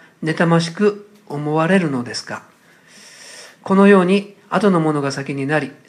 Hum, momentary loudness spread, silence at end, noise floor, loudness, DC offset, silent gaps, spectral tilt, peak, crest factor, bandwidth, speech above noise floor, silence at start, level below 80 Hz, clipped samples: none; 21 LU; 0.15 s; -47 dBFS; -17 LUFS; under 0.1%; none; -6.5 dB/octave; 0 dBFS; 18 dB; 10.5 kHz; 31 dB; 0.2 s; -70 dBFS; under 0.1%